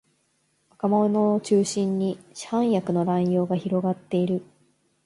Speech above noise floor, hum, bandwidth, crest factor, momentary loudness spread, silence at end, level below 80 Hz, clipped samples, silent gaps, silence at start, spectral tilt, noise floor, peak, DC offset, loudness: 46 dB; none; 11.5 kHz; 14 dB; 8 LU; 0.65 s; -68 dBFS; under 0.1%; none; 0.85 s; -7 dB/octave; -69 dBFS; -10 dBFS; under 0.1%; -24 LUFS